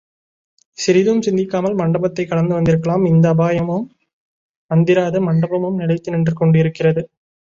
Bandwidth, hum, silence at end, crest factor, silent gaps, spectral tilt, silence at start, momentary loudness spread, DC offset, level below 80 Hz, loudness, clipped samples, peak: 7.6 kHz; none; 0.55 s; 14 dB; 4.13-4.69 s; -7.5 dB/octave; 0.8 s; 6 LU; under 0.1%; -50 dBFS; -16 LUFS; under 0.1%; -2 dBFS